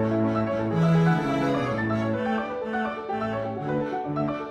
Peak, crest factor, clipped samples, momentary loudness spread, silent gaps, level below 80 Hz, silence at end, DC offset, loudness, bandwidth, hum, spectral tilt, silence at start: -10 dBFS; 16 dB; under 0.1%; 8 LU; none; -54 dBFS; 0 s; under 0.1%; -26 LUFS; 8.2 kHz; none; -8 dB/octave; 0 s